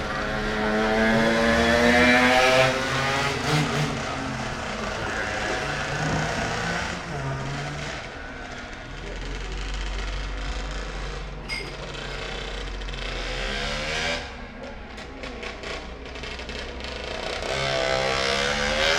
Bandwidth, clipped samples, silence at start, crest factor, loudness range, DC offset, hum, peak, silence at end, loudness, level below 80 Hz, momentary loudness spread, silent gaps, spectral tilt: 16.5 kHz; under 0.1%; 0 s; 20 dB; 13 LU; under 0.1%; none; -6 dBFS; 0 s; -25 LUFS; -36 dBFS; 17 LU; none; -4 dB/octave